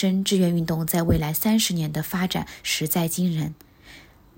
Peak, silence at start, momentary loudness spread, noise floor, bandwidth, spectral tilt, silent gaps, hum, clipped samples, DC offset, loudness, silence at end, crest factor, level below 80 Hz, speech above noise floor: -8 dBFS; 0 s; 6 LU; -48 dBFS; 17 kHz; -5 dB/octave; none; none; under 0.1%; under 0.1%; -23 LUFS; 0.35 s; 16 dB; -44 dBFS; 25 dB